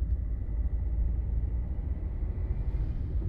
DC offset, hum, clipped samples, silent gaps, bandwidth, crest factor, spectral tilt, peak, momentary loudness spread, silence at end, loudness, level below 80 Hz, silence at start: under 0.1%; none; under 0.1%; none; 2.5 kHz; 10 dB; -11.5 dB/octave; -20 dBFS; 3 LU; 0 s; -34 LUFS; -30 dBFS; 0 s